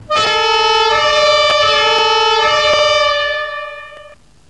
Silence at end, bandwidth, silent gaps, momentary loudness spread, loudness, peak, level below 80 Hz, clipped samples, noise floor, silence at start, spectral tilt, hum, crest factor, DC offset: 0.35 s; 10.5 kHz; none; 10 LU; -11 LUFS; -2 dBFS; -44 dBFS; under 0.1%; -41 dBFS; 0 s; -0.5 dB/octave; none; 12 dB; 0.4%